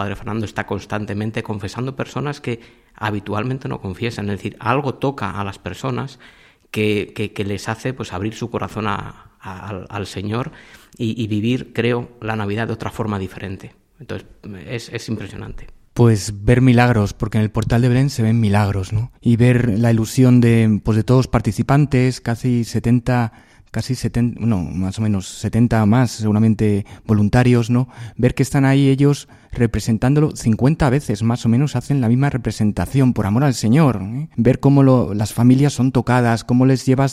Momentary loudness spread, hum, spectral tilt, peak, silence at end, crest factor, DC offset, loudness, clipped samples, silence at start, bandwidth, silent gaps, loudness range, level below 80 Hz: 13 LU; none; -7 dB/octave; 0 dBFS; 0 s; 16 dB; under 0.1%; -18 LUFS; under 0.1%; 0 s; 14 kHz; none; 9 LU; -40 dBFS